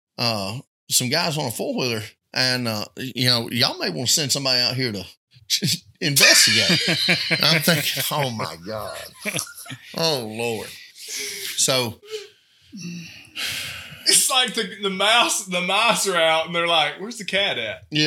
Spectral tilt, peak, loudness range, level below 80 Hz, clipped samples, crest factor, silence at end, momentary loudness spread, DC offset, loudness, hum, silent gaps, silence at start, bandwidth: -2 dB/octave; 0 dBFS; 9 LU; -66 dBFS; under 0.1%; 22 dB; 0 s; 17 LU; under 0.1%; -19 LUFS; none; 0.67-0.87 s, 5.17-5.27 s; 0.2 s; 19 kHz